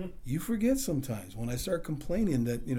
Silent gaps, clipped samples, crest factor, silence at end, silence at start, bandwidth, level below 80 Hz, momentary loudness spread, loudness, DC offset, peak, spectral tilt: none; under 0.1%; 14 dB; 0 s; 0 s; over 20 kHz; -46 dBFS; 8 LU; -32 LUFS; under 0.1%; -18 dBFS; -6 dB/octave